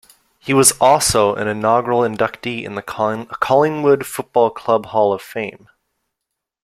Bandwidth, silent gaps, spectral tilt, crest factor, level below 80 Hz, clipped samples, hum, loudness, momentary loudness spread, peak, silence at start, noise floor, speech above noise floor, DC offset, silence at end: 16.5 kHz; none; -3.5 dB/octave; 18 dB; -48 dBFS; under 0.1%; none; -16 LUFS; 13 LU; 0 dBFS; 0.45 s; -80 dBFS; 63 dB; under 0.1%; 1.15 s